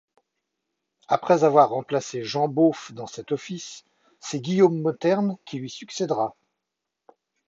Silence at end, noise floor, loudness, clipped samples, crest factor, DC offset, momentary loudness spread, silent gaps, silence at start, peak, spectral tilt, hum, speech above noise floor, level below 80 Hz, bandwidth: 1.2 s; -84 dBFS; -23 LUFS; under 0.1%; 20 dB; under 0.1%; 16 LU; none; 1.1 s; -4 dBFS; -6 dB/octave; none; 61 dB; -74 dBFS; 8 kHz